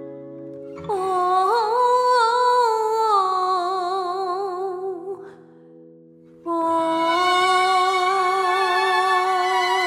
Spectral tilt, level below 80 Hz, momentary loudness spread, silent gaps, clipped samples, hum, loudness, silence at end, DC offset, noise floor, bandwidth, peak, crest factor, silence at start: -2.5 dB/octave; -72 dBFS; 16 LU; none; under 0.1%; none; -20 LUFS; 0 s; under 0.1%; -48 dBFS; 16 kHz; -6 dBFS; 14 dB; 0 s